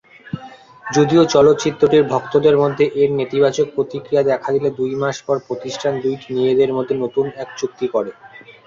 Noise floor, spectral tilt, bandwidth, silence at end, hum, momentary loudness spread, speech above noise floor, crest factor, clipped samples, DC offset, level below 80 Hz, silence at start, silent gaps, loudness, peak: -39 dBFS; -6 dB/octave; 7.6 kHz; 0.15 s; none; 12 LU; 23 dB; 16 dB; under 0.1%; under 0.1%; -56 dBFS; 0.25 s; none; -17 LUFS; -2 dBFS